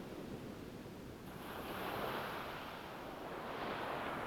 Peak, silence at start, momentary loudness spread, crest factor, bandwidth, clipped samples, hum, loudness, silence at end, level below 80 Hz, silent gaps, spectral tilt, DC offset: -28 dBFS; 0 s; 9 LU; 16 dB; over 20 kHz; under 0.1%; none; -45 LUFS; 0 s; -64 dBFS; none; -5 dB/octave; under 0.1%